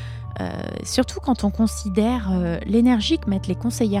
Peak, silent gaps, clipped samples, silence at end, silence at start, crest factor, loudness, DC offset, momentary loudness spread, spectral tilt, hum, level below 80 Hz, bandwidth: -6 dBFS; none; under 0.1%; 0 s; 0 s; 16 dB; -22 LUFS; 0.1%; 11 LU; -5.5 dB/octave; none; -36 dBFS; 15 kHz